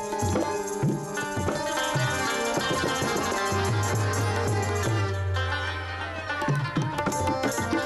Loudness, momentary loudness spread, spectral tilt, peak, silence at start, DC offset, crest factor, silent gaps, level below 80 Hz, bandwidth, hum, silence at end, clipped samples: -27 LUFS; 4 LU; -4.5 dB/octave; -16 dBFS; 0 s; under 0.1%; 12 dB; none; -50 dBFS; 14.5 kHz; none; 0 s; under 0.1%